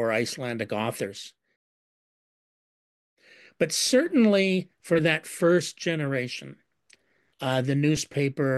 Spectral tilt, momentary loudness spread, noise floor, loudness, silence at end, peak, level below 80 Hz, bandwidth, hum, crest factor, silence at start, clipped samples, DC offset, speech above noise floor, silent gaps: -4.5 dB/octave; 13 LU; -63 dBFS; -25 LUFS; 0 s; -8 dBFS; -66 dBFS; 12.5 kHz; none; 18 dB; 0 s; under 0.1%; under 0.1%; 38 dB; 1.56-3.17 s